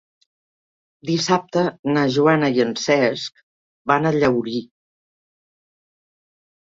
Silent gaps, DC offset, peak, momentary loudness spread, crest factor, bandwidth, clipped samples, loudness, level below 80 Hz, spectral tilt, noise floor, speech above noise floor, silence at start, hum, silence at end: 1.79-1.83 s, 3.43-3.85 s; under 0.1%; -2 dBFS; 13 LU; 20 dB; 7.8 kHz; under 0.1%; -19 LUFS; -60 dBFS; -5.5 dB/octave; under -90 dBFS; over 71 dB; 1.05 s; none; 2.1 s